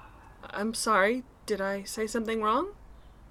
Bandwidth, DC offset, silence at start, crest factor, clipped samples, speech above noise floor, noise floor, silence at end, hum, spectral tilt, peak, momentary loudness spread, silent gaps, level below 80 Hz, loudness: 17.5 kHz; under 0.1%; 0 s; 20 dB; under 0.1%; 22 dB; -51 dBFS; 0 s; none; -3.5 dB/octave; -10 dBFS; 12 LU; none; -54 dBFS; -29 LUFS